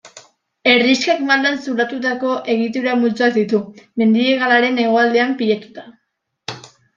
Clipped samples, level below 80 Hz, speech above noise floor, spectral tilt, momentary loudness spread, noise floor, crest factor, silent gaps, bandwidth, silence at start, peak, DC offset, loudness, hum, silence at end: under 0.1%; -66 dBFS; 29 dB; -4.5 dB/octave; 11 LU; -46 dBFS; 16 dB; none; 7.6 kHz; 0.05 s; 0 dBFS; under 0.1%; -16 LUFS; none; 0.3 s